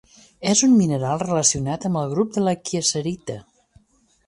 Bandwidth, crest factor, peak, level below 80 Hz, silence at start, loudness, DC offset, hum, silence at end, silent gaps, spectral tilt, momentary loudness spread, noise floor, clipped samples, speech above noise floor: 11.5 kHz; 18 dB; -4 dBFS; -54 dBFS; 0.4 s; -20 LUFS; under 0.1%; none; 0.9 s; none; -4.5 dB/octave; 12 LU; -60 dBFS; under 0.1%; 39 dB